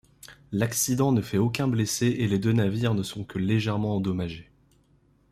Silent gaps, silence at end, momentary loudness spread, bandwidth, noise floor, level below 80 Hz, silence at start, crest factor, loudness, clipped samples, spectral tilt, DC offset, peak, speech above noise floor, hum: none; 0.9 s; 8 LU; 15.5 kHz; -63 dBFS; -56 dBFS; 0.25 s; 16 dB; -26 LUFS; under 0.1%; -5.5 dB/octave; under 0.1%; -10 dBFS; 38 dB; none